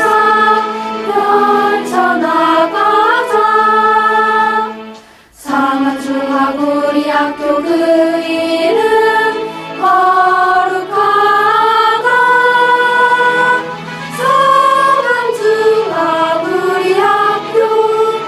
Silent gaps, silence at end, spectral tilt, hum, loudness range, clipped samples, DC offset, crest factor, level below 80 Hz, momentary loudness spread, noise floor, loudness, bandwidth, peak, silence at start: none; 0 s; -4 dB/octave; none; 4 LU; under 0.1%; under 0.1%; 12 dB; -56 dBFS; 6 LU; -38 dBFS; -11 LUFS; 14 kHz; 0 dBFS; 0 s